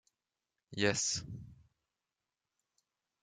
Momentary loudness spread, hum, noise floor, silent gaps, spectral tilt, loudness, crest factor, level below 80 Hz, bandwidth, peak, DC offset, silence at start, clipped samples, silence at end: 18 LU; none; under -90 dBFS; none; -2.5 dB/octave; -34 LUFS; 26 dB; -68 dBFS; 11 kHz; -16 dBFS; under 0.1%; 0.7 s; under 0.1%; 1.7 s